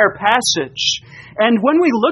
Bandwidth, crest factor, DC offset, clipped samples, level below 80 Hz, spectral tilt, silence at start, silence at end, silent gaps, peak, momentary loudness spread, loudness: 12 kHz; 16 dB; under 0.1%; under 0.1%; -56 dBFS; -3 dB/octave; 0 s; 0 s; none; 0 dBFS; 6 LU; -15 LUFS